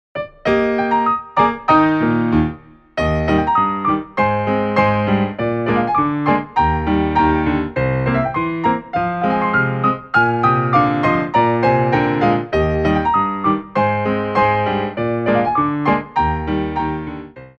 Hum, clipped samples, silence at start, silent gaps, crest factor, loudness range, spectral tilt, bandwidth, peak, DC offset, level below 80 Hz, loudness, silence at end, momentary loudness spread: none; under 0.1%; 0.15 s; none; 16 dB; 2 LU; -8.5 dB/octave; 7 kHz; 0 dBFS; under 0.1%; -34 dBFS; -17 LUFS; 0.1 s; 5 LU